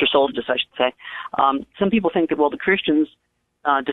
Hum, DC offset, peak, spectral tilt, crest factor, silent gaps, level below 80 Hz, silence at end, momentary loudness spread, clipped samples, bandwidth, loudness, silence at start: none; under 0.1%; -2 dBFS; -8 dB/octave; 18 dB; none; -56 dBFS; 0 s; 8 LU; under 0.1%; 4.1 kHz; -21 LUFS; 0 s